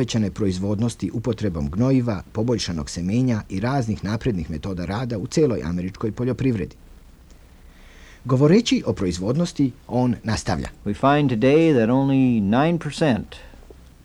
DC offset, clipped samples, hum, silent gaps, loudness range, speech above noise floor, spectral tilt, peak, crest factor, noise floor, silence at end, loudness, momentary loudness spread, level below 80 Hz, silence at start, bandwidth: under 0.1%; under 0.1%; none; none; 6 LU; 26 dB; -6.5 dB/octave; -4 dBFS; 18 dB; -47 dBFS; 0.3 s; -22 LUFS; 10 LU; -42 dBFS; 0 s; 12 kHz